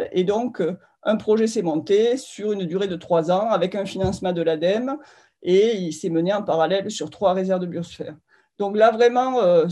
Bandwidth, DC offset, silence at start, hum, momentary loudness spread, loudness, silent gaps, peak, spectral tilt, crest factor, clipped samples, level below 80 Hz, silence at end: 12 kHz; under 0.1%; 0 s; none; 11 LU; -21 LUFS; none; -4 dBFS; -6 dB/octave; 16 dB; under 0.1%; -56 dBFS; 0 s